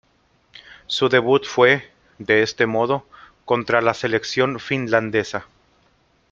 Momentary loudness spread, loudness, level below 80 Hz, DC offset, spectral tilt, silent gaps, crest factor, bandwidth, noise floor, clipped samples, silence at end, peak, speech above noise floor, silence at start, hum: 9 LU; -19 LUFS; -60 dBFS; under 0.1%; -5 dB/octave; none; 20 dB; 7.6 kHz; -61 dBFS; under 0.1%; 0.85 s; -2 dBFS; 42 dB; 0.55 s; none